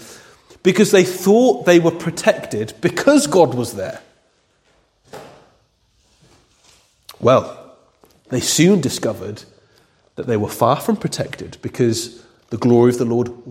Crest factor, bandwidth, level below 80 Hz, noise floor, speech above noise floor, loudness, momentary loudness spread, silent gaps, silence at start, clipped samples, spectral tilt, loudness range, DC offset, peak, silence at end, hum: 18 dB; 16.5 kHz; -56 dBFS; -60 dBFS; 44 dB; -16 LUFS; 16 LU; none; 0 s; under 0.1%; -5 dB/octave; 9 LU; under 0.1%; 0 dBFS; 0 s; none